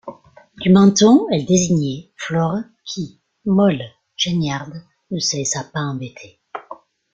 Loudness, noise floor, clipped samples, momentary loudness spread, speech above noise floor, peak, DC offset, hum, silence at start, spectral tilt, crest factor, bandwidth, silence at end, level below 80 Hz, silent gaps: -18 LUFS; -45 dBFS; under 0.1%; 22 LU; 28 dB; -2 dBFS; under 0.1%; none; 0.05 s; -5 dB/octave; 16 dB; 8.8 kHz; 0.4 s; -54 dBFS; none